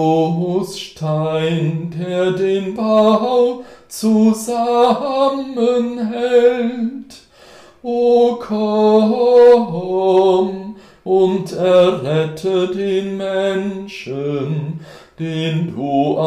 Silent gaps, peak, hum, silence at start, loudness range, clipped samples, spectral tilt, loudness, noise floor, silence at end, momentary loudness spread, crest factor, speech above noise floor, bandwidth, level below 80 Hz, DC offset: none; -2 dBFS; none; 0 s; 6 LU; under 0.1%; -6.5 dB/octave; -16 LUFS; -43 dBFS; 0 s; 12 LU; 14 dB; 28 dB; 14.5 kHz; -58 dBFS; under 0.1%